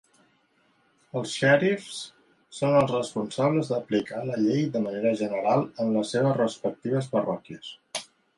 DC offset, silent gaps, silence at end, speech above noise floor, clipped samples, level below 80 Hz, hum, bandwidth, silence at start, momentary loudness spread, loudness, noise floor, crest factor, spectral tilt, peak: under 0.1%; none; 0.35 s; 41 dB; under 0.1%; -68 dBFS; none; 11.5 kHz; 1.15 s; 14 LU; -26 LUFS; -66 dBFS; 20 dB; -6 dB/octave; -8 dBFS